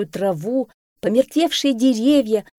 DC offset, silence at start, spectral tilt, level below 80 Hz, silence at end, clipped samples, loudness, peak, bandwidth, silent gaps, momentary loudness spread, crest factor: under 0.1%; 0 s; -5 dB/octave; -58 dBFS; 0.15 s; under 0.1%; -19 LUFS; -4 dBFS; 16.5 kHz; 0.74-0.96 s; 8 LU; 16 dB